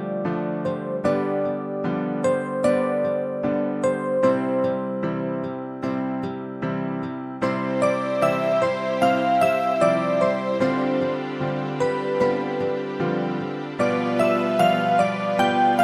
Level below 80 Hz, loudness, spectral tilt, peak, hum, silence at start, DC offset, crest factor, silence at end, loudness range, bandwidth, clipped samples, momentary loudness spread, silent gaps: -62 dBFS; -23 LUFS; -6.5 dB/octave; -6 dBFS; none; 0 s; under 0.1%; 16 dB; 0 s; 4 LU; 13.5 kHz; under 0.1%; 8 LU; none